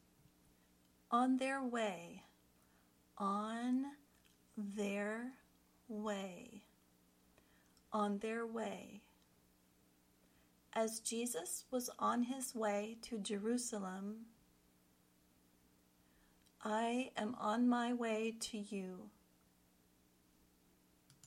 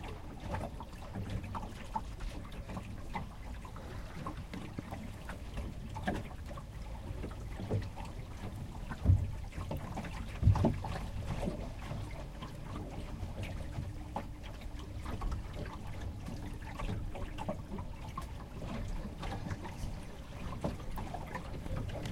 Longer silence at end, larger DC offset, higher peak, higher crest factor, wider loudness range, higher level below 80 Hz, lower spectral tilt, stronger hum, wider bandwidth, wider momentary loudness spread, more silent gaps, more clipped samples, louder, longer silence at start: about the same, 0 s vs 0 s; neither; second, -24 dBFS vs -14 dBFS; about the same, 20 dB vs 24 dB; about the same, 6 LU vs 8 LU; second, -80 dBFS vs -44 dBFS; second, -4 dB/octave vs -7 dB/octave; first, 60 Hz at -70 dBFS vs none; about the same, 16.5 kHz vs 16 kHz; first, 15 LU vs 8 LU; neither; neither; about the same, -41 LUFS vs -41 LUFS; first, 1.1 s vs 0 s